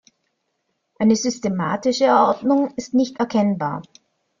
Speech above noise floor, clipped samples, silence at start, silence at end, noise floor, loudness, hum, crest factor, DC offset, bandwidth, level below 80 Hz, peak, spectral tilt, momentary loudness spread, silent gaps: 54 dB; under 0.1%; 1 s; 0.6 s; -73 dBFS; -20 LUFS; none; 18 dB; under 0.1%; 7.4 kHz; -62 dBFS; -4 dBFS; -5.5 dB/octave; 7 LU; none